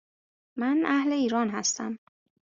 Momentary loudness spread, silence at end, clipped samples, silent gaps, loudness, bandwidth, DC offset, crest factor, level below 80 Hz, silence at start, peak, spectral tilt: 14 LU; 0.6 s; under 0.1%; none; -27 LUFS; 7.6 kHz; under 0.1%; 18 dB; -74 dBFS; 0.55 s; -10 dBFS; -3 dB/octave